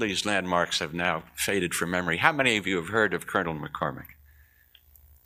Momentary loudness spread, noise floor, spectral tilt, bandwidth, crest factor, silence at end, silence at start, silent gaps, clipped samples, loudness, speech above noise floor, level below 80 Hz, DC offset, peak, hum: 9 LU; -59 dBFS; -3.5 dB/octave; 15.5 kHz; 26 dB; 1.15 s; 0 s; none; under 0.1%; -26 LUFS; 32 dB; -56 dBFS; under 0.1%; -2 dBFS; 60 Hz at -55 dBFS